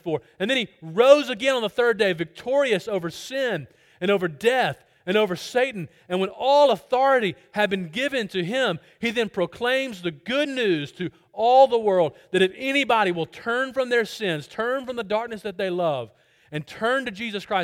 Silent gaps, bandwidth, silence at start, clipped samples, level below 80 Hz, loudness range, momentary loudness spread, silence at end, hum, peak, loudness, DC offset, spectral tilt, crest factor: none; 16 kHz; 0.05 s; under 0.1%; -66 dBFS; 5 LU; 12 LU; 0 s; none; 0 dBFS; -23 LUFS; under 0.1%; -4.5 dB/octave; 22 dB